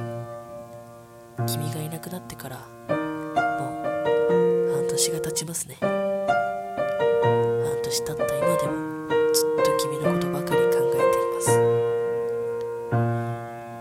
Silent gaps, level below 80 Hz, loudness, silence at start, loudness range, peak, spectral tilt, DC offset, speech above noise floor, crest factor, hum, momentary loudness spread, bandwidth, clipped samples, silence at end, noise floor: none; -58 dBFS; -24 LUFS; 0 s; 7 LU; -6 dBFS; -4.5 dB/octave; under 0.1%; 20 dB; 18 dB; none; 15 LU; 16.5 kHz; under 0.1%; 0 s; -45 dBFS